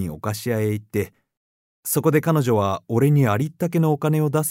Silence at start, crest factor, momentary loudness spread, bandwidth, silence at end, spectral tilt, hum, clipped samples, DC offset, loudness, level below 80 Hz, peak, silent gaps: 0 s; 16 dB; 9 LU; 16 kHz; 0 s; -6.5 dB/octave; none; under 0.1%; under 0.1%; -21 LUFS; -58 dBFS; -4 dBFS; 1.37-1.83 s